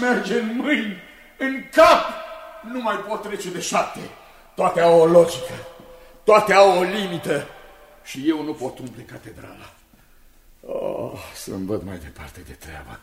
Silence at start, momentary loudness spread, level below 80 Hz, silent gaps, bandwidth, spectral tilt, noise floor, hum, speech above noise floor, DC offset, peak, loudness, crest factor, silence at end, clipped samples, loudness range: 0 s; 25 LU; -52 dBFS; none; 16 kHz; -4.5 dB/octave; -52 dBFS; none; 31 dB; under 0.1%; -2 dBFS; -19 LUFS; 20 dB; 0.05 s; under 0.1%; 15 LU